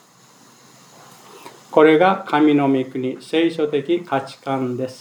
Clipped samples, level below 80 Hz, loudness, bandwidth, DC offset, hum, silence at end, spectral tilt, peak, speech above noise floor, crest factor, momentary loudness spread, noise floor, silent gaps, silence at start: under 0.1%; -80 dBFS; -18 LUFS; 12 kHz; under 0.1%; none; 0.05 s; -6.5 dB/octave; 0 dBFS; 32 dB; 20 dB; 12 LU; -50 dBFS; none; 1.35 s